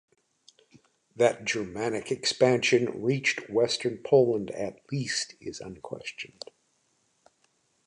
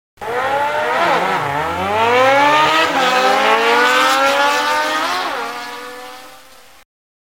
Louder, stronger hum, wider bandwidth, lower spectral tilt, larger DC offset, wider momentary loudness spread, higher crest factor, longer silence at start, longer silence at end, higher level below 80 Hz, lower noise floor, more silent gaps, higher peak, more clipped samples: second, -27 LUFS vs -14 LUFS; neither; second, 11 kHz vs 16.5 kHz; first, -4 dB/octave vs -2.5 dB/octave; second, under 0.1% vs 0.2%; first, 17 LU vs 14 LU; about the same, 20 dB vs 16 dB; first, 1.15 s vs 0.2 s; first, 1.6 s vs 1.05 s; second, -68 dBFS vs -54 dBFS; first, -71 dBFS vs -43 dBFS; neither; second, -8 dBFS vs 0 dBFS; neither